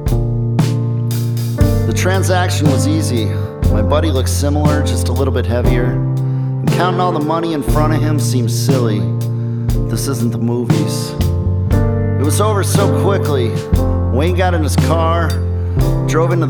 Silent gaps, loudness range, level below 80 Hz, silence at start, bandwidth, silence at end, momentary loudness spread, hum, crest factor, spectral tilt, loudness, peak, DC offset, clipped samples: none; 2 LU; -24 dBFS; 0 s; 19.5 kHz; 0 s; 4 LU; none; 14 dB; -6.5 dB/octave; -15 LUFS; 0 dBFS; under 0.1%; under 0.1%